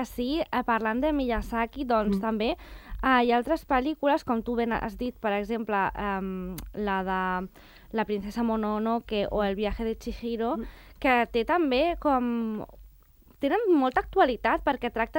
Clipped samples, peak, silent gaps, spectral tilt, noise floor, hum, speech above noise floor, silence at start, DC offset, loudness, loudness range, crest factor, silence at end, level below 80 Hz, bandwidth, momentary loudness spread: under 0.1%; -10 dBFS; none; -6.5 dB/octave; -56 dBFS; none; 29 dB; 0 s; under 0.1%; -27 LUFS; 4 LU; 18 dB; 0 s; -44 dBFS; 16.5 kHz; 10 LU